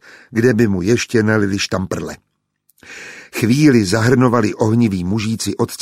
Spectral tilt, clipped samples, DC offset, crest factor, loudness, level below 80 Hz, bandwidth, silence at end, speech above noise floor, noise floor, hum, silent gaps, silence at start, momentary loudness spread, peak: -6 dB/octave; under 0.1%; under 0.1%; 16 dB; -16 LUFS; -48 dBFS; 16 kHz; 0 s; 48 dB; -63 dBFS; none; none; 0.3 s; 15 LU; -2 dBFS